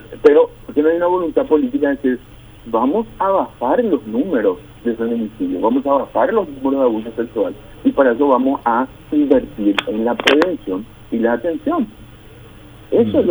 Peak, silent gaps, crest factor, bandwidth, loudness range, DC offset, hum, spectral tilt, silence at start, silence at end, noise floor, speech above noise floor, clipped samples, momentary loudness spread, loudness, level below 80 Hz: 0 dBFS; none; 16 dB; over 20 kHz; 3 LU; under 0.1%; none; -6 dB/octave; 0 s; 0 s; -40 dBFS; 23 dB; under 0.1%; 8 LU; -17 LUFS; -46 dBFS